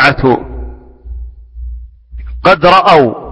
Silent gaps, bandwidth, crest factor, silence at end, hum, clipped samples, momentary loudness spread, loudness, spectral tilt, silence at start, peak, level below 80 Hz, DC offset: none; 11 kHz; 12 dB; 0 s; none; 0.7%; 25 LU; -8 LUFS; -6.5 dB/octave; 0 s; 0 dBFS; -28 dBFS; under 0.1%